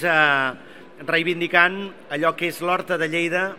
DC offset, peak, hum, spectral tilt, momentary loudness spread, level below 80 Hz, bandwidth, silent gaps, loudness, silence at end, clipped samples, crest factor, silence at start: 0.4%; 0 dBFS; none; -4.5 dB/octave; 13 LU; -72 dBFS; 16 kHz; none; -20 LUFS; 0 s; under 0.1%; 22 dB; 0 s